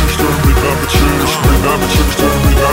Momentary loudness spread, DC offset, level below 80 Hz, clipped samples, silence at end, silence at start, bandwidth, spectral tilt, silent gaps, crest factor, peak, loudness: 1 LU; under 0.1%; -16 dBFS; under 0.1%; 0 s; 0 s; 16.5 kHz; -5 dB/octave; none; 10 dB; 0 dBFS; -12 LUFS